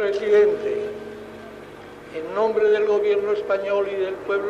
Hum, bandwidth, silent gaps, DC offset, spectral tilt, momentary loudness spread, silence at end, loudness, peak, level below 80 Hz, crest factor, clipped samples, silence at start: none; 7.4 kHz; none; under 0.1%; -5.5 dB/octave; 21 LU; 0 s; -21 LUFS; -8 dBFS; -60 dBFS; 14 dB; under 0.1%; 0 s